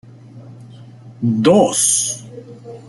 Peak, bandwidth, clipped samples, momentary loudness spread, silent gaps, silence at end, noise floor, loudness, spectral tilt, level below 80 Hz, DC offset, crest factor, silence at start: 0 dBFS; 12 kHz; under 0.1%; 24 LU; none; 0.1 s; -39 dBFS; -14 LUFS; -4 dB/octave; -58 dBFS; under 0.1%; 18 dB; 0.35 s